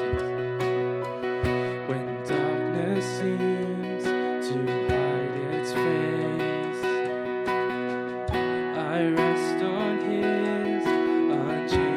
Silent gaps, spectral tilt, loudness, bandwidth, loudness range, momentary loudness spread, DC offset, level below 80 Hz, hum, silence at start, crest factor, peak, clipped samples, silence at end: none; -6.5 dB/octave; -27 LUFS; 12.5 kHz; 2 LU; 5 LU; under 0.1%; -48 dBFS; none; 0 s; 16 dB; -10 dBFS; under 0.1%; 0 s